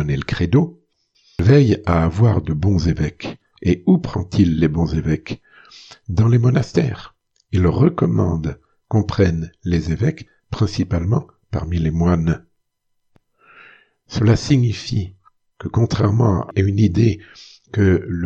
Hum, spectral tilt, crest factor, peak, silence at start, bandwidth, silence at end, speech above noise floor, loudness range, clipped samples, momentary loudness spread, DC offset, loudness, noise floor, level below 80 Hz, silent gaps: none; -8 dB/octave; 18 dB; 0 dBFS; 0 s; 7.6 kHz; 0 s; 52 dB; 4 LU; under 0.1%; 12 LU; under 0.1%; -18 LUFS; -69 dBFS; -36 dBFS; none